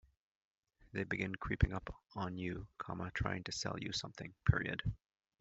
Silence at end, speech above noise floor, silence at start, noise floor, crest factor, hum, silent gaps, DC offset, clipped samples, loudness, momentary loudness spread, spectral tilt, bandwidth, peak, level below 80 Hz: 0.45 s; over 51 dB; 0.95 s; under -90 dBFS; 26 dB; none; none; under 0.1%; under 0.1%; -40 LUFS; 11 LU; -4.5 dB/octave; 8 kHz; -16 dBFS; -50 dBFS